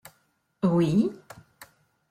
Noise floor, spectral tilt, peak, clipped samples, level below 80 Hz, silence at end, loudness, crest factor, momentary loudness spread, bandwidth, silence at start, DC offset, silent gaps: -70 dBFS; -8 dB/octave; -12 dBFS; under 0.1%; -64 dBFS; 0.45 s; -25 LUFS; 16 dB; 24 LU; 15 kHz; 0.65 s; under 0.1%; none